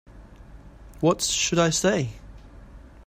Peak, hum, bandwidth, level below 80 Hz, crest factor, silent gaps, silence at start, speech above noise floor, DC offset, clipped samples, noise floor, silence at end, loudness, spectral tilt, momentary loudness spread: -8 dBFS; none; 16 kHz; -46 dBFS; 18 dB; none; 0.1 s; 23 dB; under 0.1%; under 0.1%; -46 dBFS; 0.25 s; -23 LUFS; -3.5 dB/octave; 6 LU